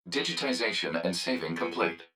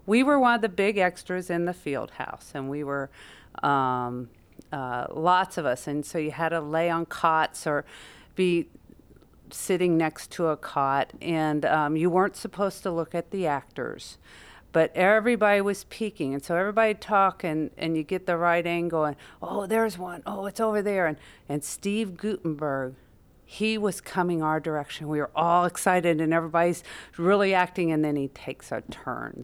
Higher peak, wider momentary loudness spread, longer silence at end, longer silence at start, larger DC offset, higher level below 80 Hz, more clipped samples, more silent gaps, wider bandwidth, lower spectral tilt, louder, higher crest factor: second, -12 dBFS vs -8 dBFS; second, 3 LU vs 13 LU; about the same, 0.1 s vs 0 s; about the same, 0.05 s vs 0.05 s; neither; second, -72 dBFS vs -60 dBFS; neither; neither; about the same, 16.5 kHz vs 17 kHz; second, -3.5 dB/octave vs -5.5 dB/octave; second, -30 LUFS vs -26 LUFS; about the same, 20 dB vs 18 dB